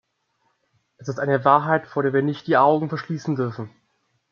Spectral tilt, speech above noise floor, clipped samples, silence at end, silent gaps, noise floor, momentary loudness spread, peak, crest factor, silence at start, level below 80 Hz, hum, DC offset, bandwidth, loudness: -7.5 dB/octave; 49 dB; under 0.1%; 0.65 s; none; -70 dBFS; 15 LU; -2 dBFS; 20 dB; 1 s; -70 dBFS; none; under 0.1%; 7.2 kHz; -21 LUFS